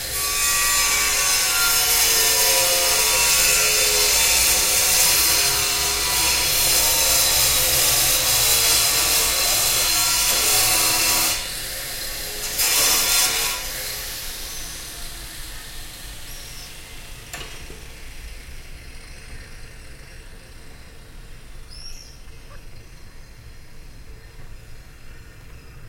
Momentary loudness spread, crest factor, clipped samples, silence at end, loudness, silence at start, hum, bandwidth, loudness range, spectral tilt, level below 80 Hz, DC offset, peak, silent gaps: 21 LU; 18 dB; under 0.1%; 0 s; -16 LUFS; 0 s; none; 16.5 kHz; 21 LU; 0.5 dB/octave; -38 dBFS; under 0.1%; -2 dBFS; none